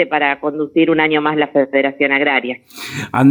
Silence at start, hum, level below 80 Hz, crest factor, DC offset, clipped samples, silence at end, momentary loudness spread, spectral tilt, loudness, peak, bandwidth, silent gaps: 0 s; none; -58 dBFS; 14 dB; under 0.1%; under 0.1%; 0 s; 12 LU; -6 dB/octave; -15 LUFS; -2 dBFS; over 20 kHz; none